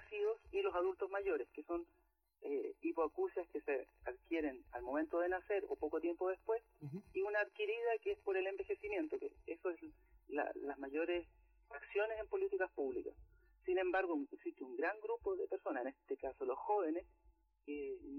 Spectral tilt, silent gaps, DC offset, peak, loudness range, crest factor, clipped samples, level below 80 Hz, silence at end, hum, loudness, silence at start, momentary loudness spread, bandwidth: -7 dB/octave; none; under 0.1%; -28 dBFS; 2 LU; 14 dB; under 0.1%; -70 dBFS; 0 s; none; -42 LUFS; 0 s; 10 LU; 6 kHz